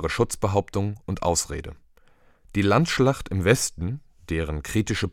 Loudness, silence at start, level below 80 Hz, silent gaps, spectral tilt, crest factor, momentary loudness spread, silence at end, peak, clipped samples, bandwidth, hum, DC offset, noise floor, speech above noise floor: -24 LUFS; 0 s; -40 dBFS; none; -5 dB/octave; 20 dB; 11 LU; 0 s; -4 dBFS; under 0.1%; 17 kHz; none; under 0.1%; -56 dBFS; 32 dB